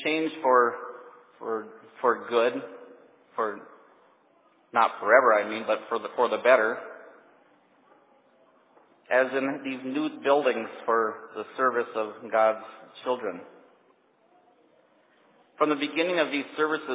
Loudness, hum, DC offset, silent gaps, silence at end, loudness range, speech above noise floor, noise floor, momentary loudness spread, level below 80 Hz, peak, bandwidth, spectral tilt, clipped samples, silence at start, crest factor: -26 LUFS; none; under 0.1%; none; 0 s; 7 LU; 38 dB; -63 dBFS; 18 LU; -88 dBFS; -4 dBFS; 4 kHz; -7.5 dB/octave; under 0.1%; 0 s; 22 dB